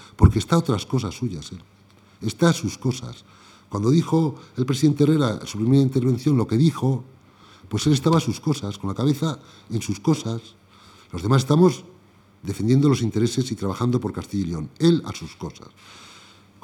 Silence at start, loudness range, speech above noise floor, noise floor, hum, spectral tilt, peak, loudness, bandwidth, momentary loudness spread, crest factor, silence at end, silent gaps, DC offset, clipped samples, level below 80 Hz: 0.2 s; 4 LU; 32 dB; -53 dBFS; 50 Hz at -50 dBFS; -6.5 dB/octave; 0 dBFS; -22 LUFS; 16 kHz; 15 LU; 22 dB; 0.6 s; none; under 0.1%; under 0.1%; -42 dBFS